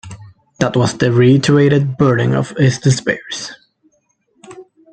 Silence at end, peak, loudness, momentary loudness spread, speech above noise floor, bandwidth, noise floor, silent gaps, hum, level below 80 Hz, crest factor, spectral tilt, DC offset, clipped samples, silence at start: 0.3 s; 0 dBFS; -14 LUFS; 14 LU; 49 dB; 9.2 kHz; -62 dBFS; none; none; -48 dBFS; 14 dB; -6 dB/octave; under 0.1%; under 0.1%; 0.05 s